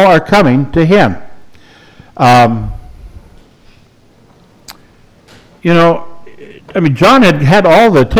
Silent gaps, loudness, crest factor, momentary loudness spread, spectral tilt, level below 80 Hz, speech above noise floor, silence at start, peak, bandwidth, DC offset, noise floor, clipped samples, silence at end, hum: none; -9 LUFS; 10 dB; 14 LU; -6.5 dB/octave; -32 dBFS; 37 dB; 0 s; 0 dBFS; over 20 kHz; under 0.1%; -45 dBFS; under 0.1%; 0 s; none